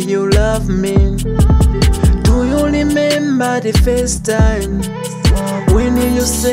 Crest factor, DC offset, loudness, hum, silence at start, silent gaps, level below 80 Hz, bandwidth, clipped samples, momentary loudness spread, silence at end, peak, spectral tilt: 12 dB; under 0.1%; -14 LUFS; none; 0 s; none; -16 dBFS; 16.5 kHz; under 0.1%; 4 LU; 0 s; -2 dBFS; -5.5 dB/octave